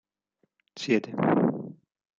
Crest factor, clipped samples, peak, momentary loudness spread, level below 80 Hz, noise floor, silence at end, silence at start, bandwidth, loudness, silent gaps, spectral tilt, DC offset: 20 dB; under 0.1%; -10 dBFS; 15 LU; -72 dBFS; -75 dBFS; 0.45 s; 0.75 s; 7.6 kHz; -26 LUFS; none; -6.5 dB/octave; under 0.1%